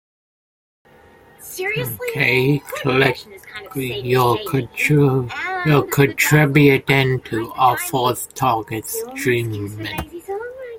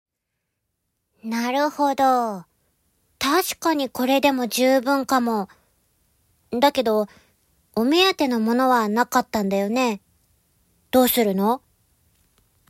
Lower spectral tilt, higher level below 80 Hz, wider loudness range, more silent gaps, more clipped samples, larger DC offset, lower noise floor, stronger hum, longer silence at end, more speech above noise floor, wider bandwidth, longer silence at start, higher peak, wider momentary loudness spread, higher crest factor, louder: first, -5.5 dB/octave vs -4 dB/octave; first, -50 dBFS vs -62 dBFS; about the same, 5 LU vs 3 LU; neither; neither; neither; second, -48 dBFS vs -79 dBFS; neither; second, 0 s vs 1.1 s; second, 30 dB vs 59 dB; about the same, 17 kHz vs 16 kHz; first, 1.4 s vs 1.25 s; first, 0 dBFS vs -4 dBFS; first, 15 LU vs 11 LU; about the same, 18 dB vs 18 dB; first, -18 LUFS vs -21 LUFS